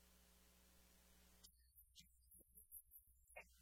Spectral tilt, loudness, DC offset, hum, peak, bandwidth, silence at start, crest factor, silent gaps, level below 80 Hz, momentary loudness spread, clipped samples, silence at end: -2 dB/octave; -65 LUFS; under 0.1%; none; -46 dBFS; 18 kHz; 0 s; 22 dB; none; -76 dBFS; 8 LU; under 0.1%; 0 s